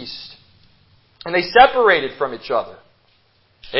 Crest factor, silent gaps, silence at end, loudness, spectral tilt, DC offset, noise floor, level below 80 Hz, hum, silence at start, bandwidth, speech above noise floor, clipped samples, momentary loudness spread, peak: 20 dB; none; 0 s; -16 LUFS; -7.5 dB/octave; under 0.1%; -58 dBFS; -52 dBFS; none; 0 s; 5.8 kHz; 42 dB; under 0.1%; 23 LU; 0 dBFS